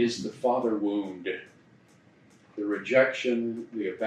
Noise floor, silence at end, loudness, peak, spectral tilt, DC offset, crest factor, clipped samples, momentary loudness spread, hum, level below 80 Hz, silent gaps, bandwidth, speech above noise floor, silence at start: -59 dBFS; 0 s; -28 LUFS; -8 dBFS; -5 dB/octave; under 0.1%; 22 dB; under 0.1%; 12 LU; none; -78 dBFS; none; 10 kHz; 31 dB; 0 s